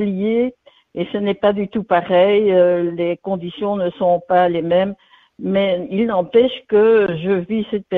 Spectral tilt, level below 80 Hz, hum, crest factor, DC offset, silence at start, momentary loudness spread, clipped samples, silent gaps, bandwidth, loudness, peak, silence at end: -9.5 dB/octave; -56 dBFS; none; 14 dB; under 0.1%; 0 s; 10 LU; under 0.1%; none; 4.3 kHz; -17 LUFS; -2 dBFS; 0 s